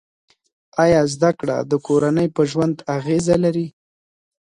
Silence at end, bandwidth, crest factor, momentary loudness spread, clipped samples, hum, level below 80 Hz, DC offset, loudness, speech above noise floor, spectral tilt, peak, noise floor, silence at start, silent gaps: 0.9 s; 11.5 kHz; 18 dB; 8 LU; under 0.1%; none; -50 dBFS; under 0.1%; -19 LUFS; over 72 dB; -6.5 dB/octave; -2 dBFS; under -90 dBFS; 0.75 s; none